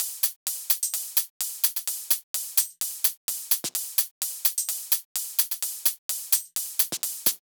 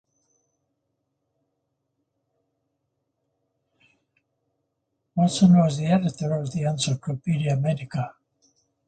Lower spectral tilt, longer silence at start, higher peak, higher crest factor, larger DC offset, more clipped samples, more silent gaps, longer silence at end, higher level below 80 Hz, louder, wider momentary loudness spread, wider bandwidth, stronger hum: second, 2 dB/octave vs -6.5 dB/octave; second, 0 s vs 5.15 s; about the same, -6 dBFS vs -6 dBFS; about the same, 22 dB vs 20 dB; neither; neither; first, 0.36-0.46 s, 1.30-1.40 s, 2.23-2.34 s, 3.17-3.28 s, 4.11-4.21 s, 5.05-5.15 s, 5.98-6.09 s vs none; second, 0.1 s vs 0.75 s; second, -84 dBFS vs -62 dBFS; about the same, -25 LUFS vs -23 LUFS; second, 4 LU vs 14 LU; first, over 20 kHz vs 9.2 kHz; neither